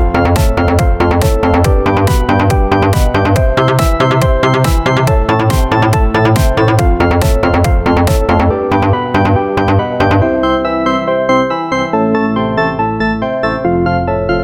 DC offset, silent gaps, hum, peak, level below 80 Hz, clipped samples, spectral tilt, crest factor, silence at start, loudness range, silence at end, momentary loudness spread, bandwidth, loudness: under 0.1%; none; none; 0 dBFS; -18 dBFS; under 0.1%; -6.5 dB/octave; 10 dB; 0 s; 2 LU; 0 s; 3 LU; 17.5 kHz; -12 LUFS